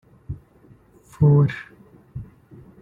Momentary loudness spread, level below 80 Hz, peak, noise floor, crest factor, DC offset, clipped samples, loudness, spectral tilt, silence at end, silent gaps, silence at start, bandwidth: 25 LU; -48 dBFS; -6 dBFS; -52 dBFS; 18 dB; under 0.1%; under 0.1%; -18 LUFS; -10 dB/octave; 0.6 s; none; 0.3 s; 4.1 kHz